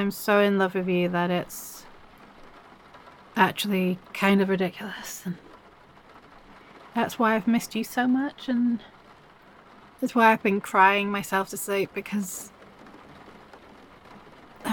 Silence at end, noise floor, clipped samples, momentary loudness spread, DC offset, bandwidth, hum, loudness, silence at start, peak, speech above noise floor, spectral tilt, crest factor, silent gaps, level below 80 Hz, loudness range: 0 s; -52 dBFS; under 0.1%; 16 LU; under 0.1%; 17.5 kHz; none; -25 LUFS; 0 s; -6 dBFS; 28 dB; -5 dB/octave; 22 dB; none; -62 dBFS; 5 LU